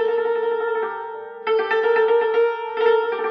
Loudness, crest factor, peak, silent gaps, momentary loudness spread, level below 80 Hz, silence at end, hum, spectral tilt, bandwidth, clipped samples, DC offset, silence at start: -20 LUFS; 12 dB; -8 dBFS; none; 10 LU; -84 dBFS; 0 s; none; -3.5 dB/octave; 5.2 kHz; under 0.1%; under 0.1%; 0 s